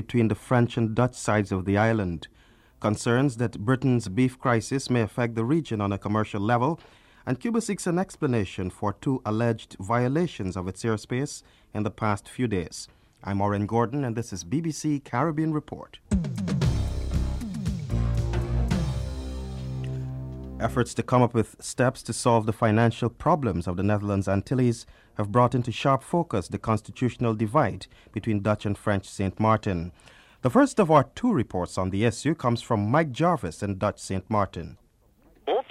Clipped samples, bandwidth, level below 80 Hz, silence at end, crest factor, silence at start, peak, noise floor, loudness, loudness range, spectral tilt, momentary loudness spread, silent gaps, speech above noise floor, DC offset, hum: under 0.1%; 13 kHz; -40 dBFS; 0.1 s; 20 dB; 0 s; -6 dBFS; -60 dBFS; -26 LUFS; 4 LU; -6.5 dB/octave; 10 LU; none; 35 dB; under 0.1%; none